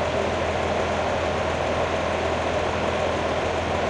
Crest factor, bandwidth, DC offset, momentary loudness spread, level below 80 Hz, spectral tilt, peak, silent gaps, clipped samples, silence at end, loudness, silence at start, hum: 12 dB; 11 kHz; under 0.1%; 1 LU; -42 dBFS; -5 dB/octave; -12 dBFS; none; under 0.1%; 0 s; -24 LUFS; 0 s; none